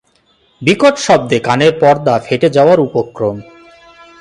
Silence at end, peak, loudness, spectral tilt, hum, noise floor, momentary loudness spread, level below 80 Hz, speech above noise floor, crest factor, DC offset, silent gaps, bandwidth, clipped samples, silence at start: 0.8 s; 0 dBFS; -12 LUFS; -5.5 dB/octave; none; -55 dBFS; 9 LU; -52 dBFS; 43 dB; 12 dB; under 0.1%; none; 11.5 kHz; under 0.1%; 0.6 s